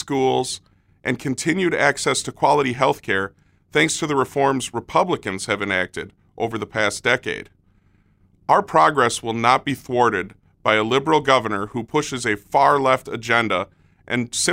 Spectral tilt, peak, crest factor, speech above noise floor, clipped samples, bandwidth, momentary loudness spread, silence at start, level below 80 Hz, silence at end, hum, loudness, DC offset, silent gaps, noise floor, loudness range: -3.5 dB/octave; 0 dBFS; 20 dB; 38 dB; under 0.1%; 16 kHz; 10 LU; 0 s; -56 dBFS; 0 s; none; -20 LUFS; under 0.1%; none; -58 dBFS; 4 LU